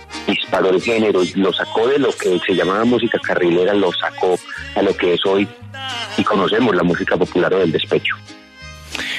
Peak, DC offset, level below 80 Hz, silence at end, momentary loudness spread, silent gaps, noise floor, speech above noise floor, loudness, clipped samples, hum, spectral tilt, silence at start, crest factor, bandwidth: -4 dBFS; under 0.1%; -48 dBFS; 0 s; 9 LU; none; -37 dBFS; 21 dB; -17 LUFS; under 0.1%; none; -5 dB/octave; 0 s; 14 dB; 13 kHz